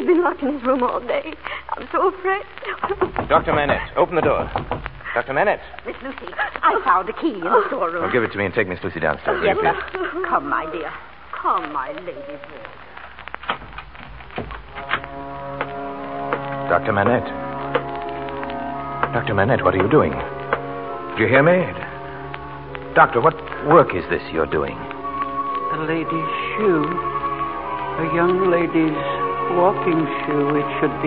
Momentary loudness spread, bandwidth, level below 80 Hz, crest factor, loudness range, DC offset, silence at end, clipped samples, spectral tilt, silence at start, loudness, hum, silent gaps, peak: 15 LU; 5.2 kHz; -44 dBFS; 20 dB; 9 LU; 0.6%; 0 s; under 0.1%; -11 dB/octave; 0 s; -21 LUFS; none; none; -2 dBFS